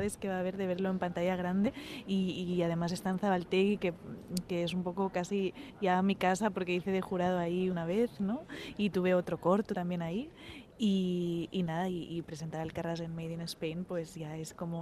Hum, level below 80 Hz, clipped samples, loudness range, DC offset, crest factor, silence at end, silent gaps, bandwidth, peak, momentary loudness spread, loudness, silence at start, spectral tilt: none; -62 dBFS; under 0.1%; 3 LU; under 0.1%; 18 dB; 0 s; none; 14 kHz; -16 dBFS; 9 LU; -34 LUFS; 0 s; -6.5 dB/octave